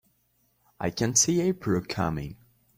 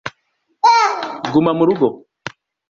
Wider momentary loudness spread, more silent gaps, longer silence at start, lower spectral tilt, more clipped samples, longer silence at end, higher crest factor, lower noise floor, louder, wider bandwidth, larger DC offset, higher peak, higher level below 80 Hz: second, 13 LU vs 21 LU; neither; first, 0.8 s vs 0.05 s; second, -4 dB/octave vs -5.5 dB/octave; neither; about the same, 0.45 s vs 0.4 s; about the same, 20 dB vs 16 dB; first, -70 dBFS vs -66 dBFS; second, -26 LUFS vs -15 LUFS; first, 16 kHz vs 7.4 kHz; neither; second, -8 dBFS vs -2 dBFS; first, -54 dBFS vs -60 dBFS